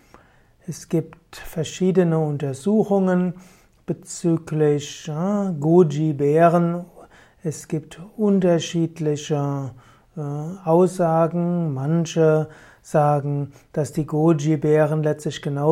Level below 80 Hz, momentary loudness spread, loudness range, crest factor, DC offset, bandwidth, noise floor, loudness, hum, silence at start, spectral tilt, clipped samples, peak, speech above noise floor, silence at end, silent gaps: -56 dBFS; 14 LU; 3 LU; 18 dB; under 0.1%; 15 kHz; -54 dBFS; -21 LUFS; none; 0.7 s; -7 dB/octave; under 0.1%; -2 dBFS; 34 dB; 0 s; none